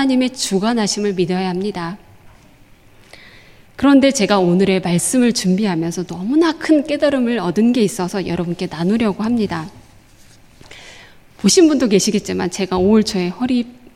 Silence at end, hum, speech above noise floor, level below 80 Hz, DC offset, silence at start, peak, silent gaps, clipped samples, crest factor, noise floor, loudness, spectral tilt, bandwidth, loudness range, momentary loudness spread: 0.05 s; none; 31 dB; -48 dBFS; under 0.1%; 0 s; -2 dBFS; none; under 0.1%; 16 dB; -46 dBFS; -16 LUFS; -5 dB/octave; 15.5 kHz; 6 LU; 10 LU